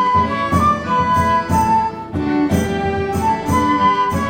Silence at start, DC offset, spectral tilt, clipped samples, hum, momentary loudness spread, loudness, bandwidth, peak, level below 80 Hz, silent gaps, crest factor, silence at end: 0 s; under 0.1%; -6 dB/octave; under 0.1%; none; 5 LU; -16 LUFS; 17.5 kHz; -2 dBFS; -34 dBFS; none; 14 dB; 0 s